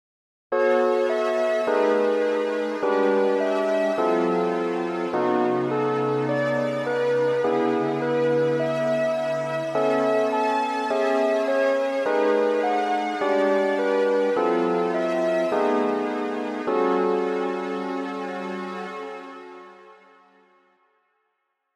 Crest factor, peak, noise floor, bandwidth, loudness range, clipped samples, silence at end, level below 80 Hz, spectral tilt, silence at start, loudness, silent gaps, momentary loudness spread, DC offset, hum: 14 dB; -10 dBFS; -75 dBFS; 12 kHz; 6 LU; under 0.1%; 1.85 s; -80 dBFS; -6 dB/octave; 0.5 s; -23 LUFS; none; 7 LU; under 0.1%; none